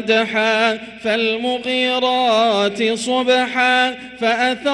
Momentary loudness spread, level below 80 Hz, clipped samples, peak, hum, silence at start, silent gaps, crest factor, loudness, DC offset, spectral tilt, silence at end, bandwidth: 5 LU; -60 dBFS; under 0.1%; -4 dBFS; none; 0 s; none; 14 dB; -17 LUFS; under 0.1%; -3 dB/octave; 0 s; 11.5 kHz